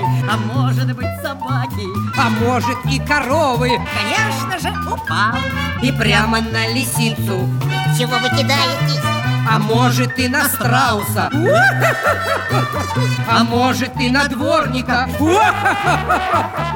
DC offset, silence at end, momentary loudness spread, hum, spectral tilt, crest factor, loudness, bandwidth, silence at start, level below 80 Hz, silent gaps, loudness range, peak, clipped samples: under 0.1%; 0 s; 6 LU; none; -5 dB/octave; 14 dB; -16 LUFS; 18 kHz; 0 s; -38 dBFS; none; 2 LU; -2 dBFS; under 0.1%